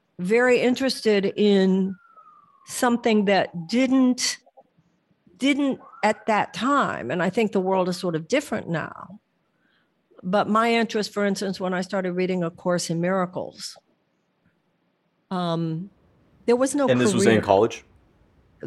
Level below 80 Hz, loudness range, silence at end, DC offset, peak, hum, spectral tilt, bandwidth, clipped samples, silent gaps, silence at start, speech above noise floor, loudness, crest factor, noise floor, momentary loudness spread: -68 dBFS; 6 LU; 0 s; under 0.1%; -2 dBFS; none; -5 dB/octave; 12.5 kHz; under 0.1%; none; 0.2 s; 48 dB; -23 LUFS; 22 dB; -70 dBFS; 12 LU